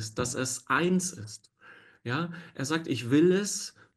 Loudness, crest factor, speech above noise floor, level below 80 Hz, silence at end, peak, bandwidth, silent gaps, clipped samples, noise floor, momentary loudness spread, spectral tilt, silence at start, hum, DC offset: -28 LUFS; 18 dB; 27 dB; -64 dBFS; 0.25 s; -12 dBFS; 12.5 kHz; none; under 0.1%; -55 dBFS; 18 LU; -4.5 dB/octave; 0 s; none; under 0.1%